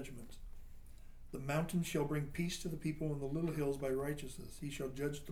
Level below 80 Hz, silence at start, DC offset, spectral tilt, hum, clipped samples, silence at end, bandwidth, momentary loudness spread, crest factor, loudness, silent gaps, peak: -54 dBFS; 0 s; under 0.1%; -6 dB/octave; none; under 0.1%; 0 s; 17.5 kHz; 18 LU; 16 dB; -40 LUFS; none; -26 dBFS